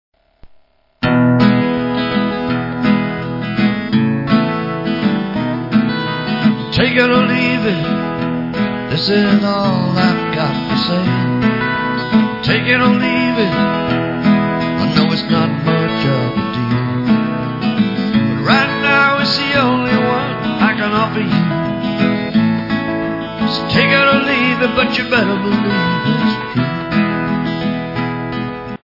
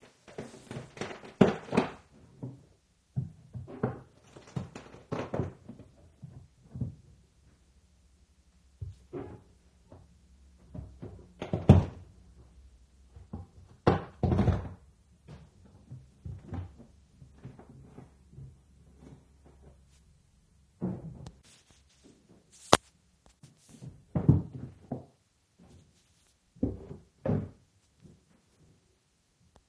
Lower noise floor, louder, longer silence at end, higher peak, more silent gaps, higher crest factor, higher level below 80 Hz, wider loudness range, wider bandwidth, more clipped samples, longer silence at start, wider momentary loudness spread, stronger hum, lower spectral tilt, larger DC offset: second, -49 dBFS vs -71 dBFS; first, -15 LUFS vs -32 LUFS; second, 0.15 s vs 2.2 s; about the same, 0 dBFS vs 0 dBFS; neither; second, 14 dB vs 36 dB; first, -44 dBFS vs -50 dBFS; second, 3 LU vs 18 LU; second, 5.8 kHz vs 11 kHz; neither; about the same, 0.45 s vs 0.4 s; second, 7 LU vs 27 LU; neither; about the same, -7.5 dB/octave vs -6.5 dB/octave; neither